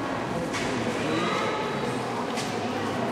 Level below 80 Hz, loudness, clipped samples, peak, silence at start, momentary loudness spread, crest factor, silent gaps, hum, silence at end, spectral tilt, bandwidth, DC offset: -56 dBFS; -28 LUFS; under 0.1%; -14 dBFS; 0 s; 3 LU; 14 dB; none; none; 0 s; -4.5 dB/octave; 15.5 kHz; under 0.1%